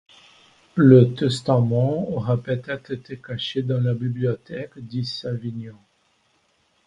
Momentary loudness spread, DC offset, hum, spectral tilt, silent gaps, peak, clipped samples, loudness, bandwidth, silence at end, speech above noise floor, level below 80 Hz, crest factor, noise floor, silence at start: 19 LU; under 0.1%; none; -8 dB/octave; none; 0 dBFS; under 0.1%; -21 LUFS; 10 kHz; 1.15 s; 44 dB; -58 dBFS; 22 dB; -65 dBFS; 0.75 s